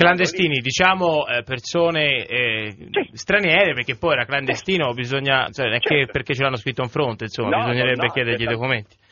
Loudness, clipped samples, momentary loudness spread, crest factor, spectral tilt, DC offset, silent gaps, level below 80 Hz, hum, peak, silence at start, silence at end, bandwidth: -20 LUFS; under 0.1%; 8 LU; 20 dB; -2.5 dB/octave; under 0.1%; none; -52 dBFS; none; 0 dBFS; 0 s; 0.25 s; 7.2 kHz